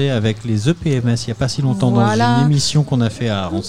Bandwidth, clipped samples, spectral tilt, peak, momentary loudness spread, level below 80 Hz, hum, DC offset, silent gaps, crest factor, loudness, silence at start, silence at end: 12 kHz; under 0.1%; -6 dB/octave; -2 dBFS; 5 LU; -42 dBFS; none; 1%; none; 14 dB; -17 LUFS; 0 s; 0 s